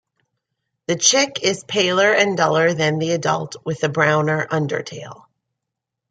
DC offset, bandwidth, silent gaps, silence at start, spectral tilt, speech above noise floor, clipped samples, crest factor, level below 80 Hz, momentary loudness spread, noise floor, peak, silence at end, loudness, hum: under 0.1%; 9.6 kHz; none; 0.9 s; -3 dB/octave; 63 dB; under 0.1%; 18 dB; -64 dBFS; 12 LU; -82 dBFS; -2 dBFS; 0.95 s; -18 LUFS; none